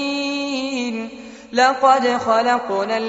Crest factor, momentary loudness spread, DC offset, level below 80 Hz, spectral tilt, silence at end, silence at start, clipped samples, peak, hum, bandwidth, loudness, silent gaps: 16 dB; 12 LU; under 0.1%; -60 dBFS; -1 dB/octave; 0 s; 0 s; under 0.1%; -2 dBFS; none; 8 kHz; -18 LUFS; none